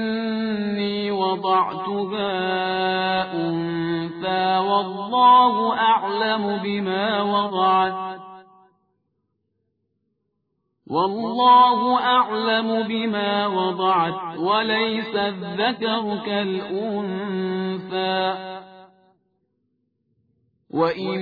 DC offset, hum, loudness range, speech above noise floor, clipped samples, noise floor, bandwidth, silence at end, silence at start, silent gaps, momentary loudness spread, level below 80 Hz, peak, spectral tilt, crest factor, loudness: under 0.1%; none; 9 LU; 53 dB; under 0.1%; -74 dBFS; 5 kHz; 0 s; 0 s; none; 9 LU; -66 dBFS; -4 dBFS; -8 dB/octave; 18 dB; -21 LUFS